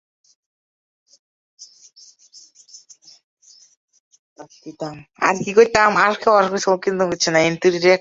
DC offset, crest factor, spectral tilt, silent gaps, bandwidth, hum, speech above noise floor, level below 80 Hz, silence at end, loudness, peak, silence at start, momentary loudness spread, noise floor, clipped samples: under 0.1%; 20 dB; -4 dB/octave; 3.23-3.37 s, 3.77-3.88 s, 4.00-4.11 s, 4.19-4.36 s; 7.8 kHz; none; 32 dB; -58 dBFS; 0 s; -16 LUFS; -2 dBFS; 1.6 s; 18 LU; -49 dBFS; under 0.1%